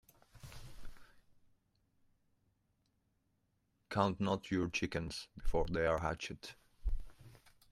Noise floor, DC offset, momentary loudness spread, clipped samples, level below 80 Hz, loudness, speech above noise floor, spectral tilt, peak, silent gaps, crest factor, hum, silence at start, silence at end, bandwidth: -80 dBFS; under 0.1%; 21 LU; under 0.1%; -48 dBFS; -38 LUFS; 43 dB; -5.5 dB/octave; -16 dBFS; none; 24 dB; none; 0.35 s; 0.35 s; 13.5 kHz